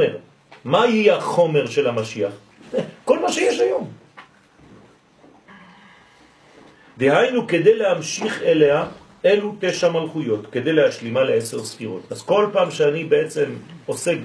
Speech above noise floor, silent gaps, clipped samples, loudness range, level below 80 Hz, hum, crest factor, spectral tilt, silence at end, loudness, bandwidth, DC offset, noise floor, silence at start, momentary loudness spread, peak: 32 dB; none; under 0.1%; 6 LU; -64 dBFS; none; 18 dB; -5 dB/octave; 0 s; -20 LUFS; 11 kHz; under 0.1%; -51 dBFS; 0 s; 12 LU; -2 dBFS